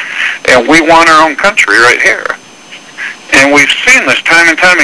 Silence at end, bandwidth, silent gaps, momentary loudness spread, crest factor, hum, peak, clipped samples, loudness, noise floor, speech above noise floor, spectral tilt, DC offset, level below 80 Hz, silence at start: 0 s; 11 kHz; none; 14 LU; 8 dB; none; 0 dBFS; 4%; -5 LUFS; -31 dBFS; 26 dB; -2 dB/octave; under 0.1%; -40 dBFS; 0 s